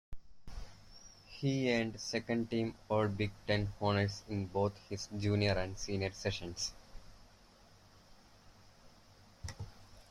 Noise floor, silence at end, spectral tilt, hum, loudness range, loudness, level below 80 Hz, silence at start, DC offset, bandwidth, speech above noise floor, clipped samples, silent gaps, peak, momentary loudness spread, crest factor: -62 dBFS; 0.1 s; -5.5 dB/octave; none; 13 LU; -36 LUFS; -56 dBFS; 0.1 s; under 0.1%; 12 kHz; 27 dB; under 0.1%; none; -16 dBFS; 20 LU; 22 dB